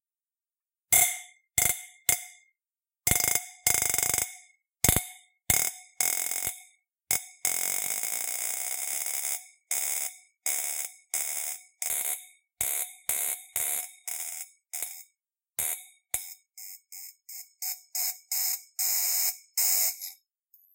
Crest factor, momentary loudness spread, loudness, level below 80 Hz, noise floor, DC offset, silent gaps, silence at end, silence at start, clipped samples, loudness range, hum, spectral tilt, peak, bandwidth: 30 dB; 15 LU; -27 LUFS; -54 dBFS; under -90 dBFS; under 0.1%; none; 0.6 s; 0.9 s; under 0.1%; 7 LU; none; -0.5 dB/octave; 0 dBFS; 17.5 kHz